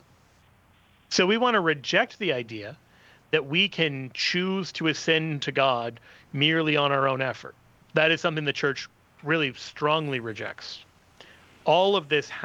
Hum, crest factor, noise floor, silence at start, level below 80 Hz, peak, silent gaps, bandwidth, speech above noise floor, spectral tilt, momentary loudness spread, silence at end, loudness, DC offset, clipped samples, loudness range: none; 20 dB; -60 dBFS; 1.1 s; -68 dBFS; -6 dBFS; none; 8.6 kHz; 34 dB; -4.5 dB/octave; 15 LU; 0 s; -25 LUFS; under 0.1%; under 0.1%; 2 LU